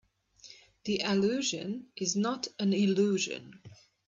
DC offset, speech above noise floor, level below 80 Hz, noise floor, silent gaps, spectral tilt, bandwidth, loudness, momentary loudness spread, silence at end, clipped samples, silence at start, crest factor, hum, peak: under 0.1%; 27 dB; -74 dBFS; -57 dBFS; none; -4.5 dB/octave; 7.6 kHz; -30 LUFS; 15 LU; 0.35 s; under 0.1%; 0.45 s; 16 dB; none; -16 dBFS